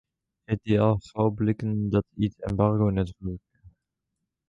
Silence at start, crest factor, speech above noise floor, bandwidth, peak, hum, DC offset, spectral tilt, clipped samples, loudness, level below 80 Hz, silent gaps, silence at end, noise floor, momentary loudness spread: 0.5 s; 18 dB; 58 dB; 7.6 kHz; -8 dBFS; none; under 0.1%; -9.5 dB/octave; under 0.1%; -26 LUFS; -46 dBFS; none; 0.8 s; -83 dBFS; 9 LU